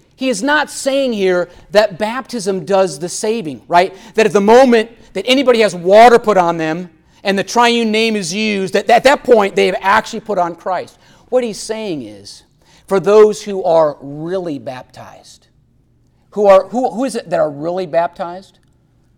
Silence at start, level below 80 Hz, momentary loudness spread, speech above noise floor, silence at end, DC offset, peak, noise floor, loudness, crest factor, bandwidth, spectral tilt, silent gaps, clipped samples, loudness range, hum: 0.2 s; -52 dBFS; 14 LU; 40 dB; 0.75 s; under 0.1%; 0 dBFS; -54 dBFS; -14 LUFS; 14 dB; 17 kHz; -4 dB/octave; none; under 0.1%; 7 LU; none